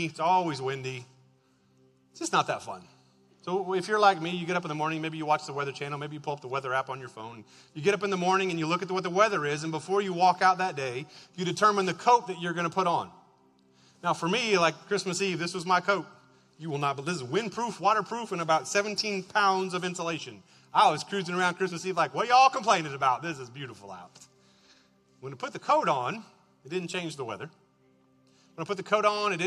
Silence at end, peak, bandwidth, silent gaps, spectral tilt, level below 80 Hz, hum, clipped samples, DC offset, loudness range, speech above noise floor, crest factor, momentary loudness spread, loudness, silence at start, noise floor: 0 s; -8 dBFS; 12.5 kHz; none; -4 dB/octave; -76 dBFS; none; under 0.1%; under 0.1%; 6 LU; 37 dB; 22 dB; 16 LU; -28 LUFS; 0 s; -65 dBFS